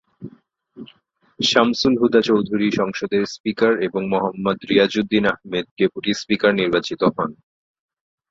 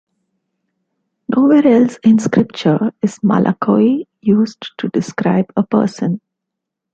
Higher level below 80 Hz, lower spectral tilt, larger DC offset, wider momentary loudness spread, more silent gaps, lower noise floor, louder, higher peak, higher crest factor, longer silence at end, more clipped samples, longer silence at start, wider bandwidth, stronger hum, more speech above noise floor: about the same, -56 dBFS vs -56 dBFS; second, -5 dB/octave vs -7.5 dB/octave; neither; about the same, 9 LU vs 9 LU; first, 3.40-3.44 s, 5.71-5.76 s vs none; second, -58 dBFS vs -80 dBFS; second, -19 LUFS vs -15 LUFS; about the same, -2 dBFS vs 0 dBFS; about the same, 18 dB vs 14 dB; first, 0.95 s vs 0.75 s; neither; second, 0.2 s vs 1.3 s; about the same, 7.8 kHz vs 8 kHz; neither; second, 39 dB vs 66 dB